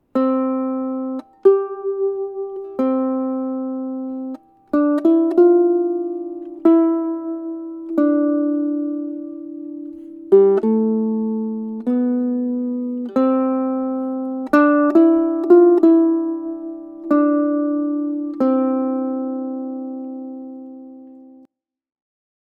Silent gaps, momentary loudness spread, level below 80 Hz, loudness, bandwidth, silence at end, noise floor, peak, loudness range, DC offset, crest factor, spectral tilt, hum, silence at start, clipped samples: none; 17 LU; -68 dBFS; -18 LUFS; 4.3 kHz; 1.2 s; -57 dBFS; 0 dBFS; 7 LU; under 0.1%; 18 dB; -9 dB/octave; none; 0.15 s; under 0.1%